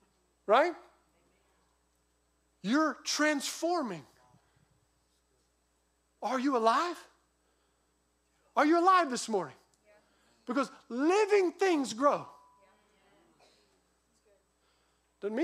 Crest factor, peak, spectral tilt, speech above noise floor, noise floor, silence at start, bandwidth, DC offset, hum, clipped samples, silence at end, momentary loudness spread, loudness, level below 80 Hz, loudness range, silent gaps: 20 dB; -12 dBFS; -3.5 dB/octave; 46 dB; -74 dBFS; 0.5 s; 15.5 kHz; under 0.1%; none; under 0.1%; 0 s; 16 LU; -29 LUFS; -80 dBFS; 6 LU; none